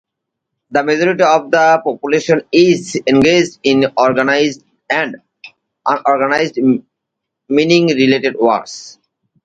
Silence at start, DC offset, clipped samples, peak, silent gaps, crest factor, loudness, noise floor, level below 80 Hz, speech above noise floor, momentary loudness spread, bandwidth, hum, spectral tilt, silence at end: 0.7 s; under 0.1%; under 0.1%; 0 dBFS; none; 14 dB; -13 LUFS; -77 dBFS; -56 dBFS; 65 dB; 8 LU; 9 kHz; none; -5 dB/octave; 0.55 s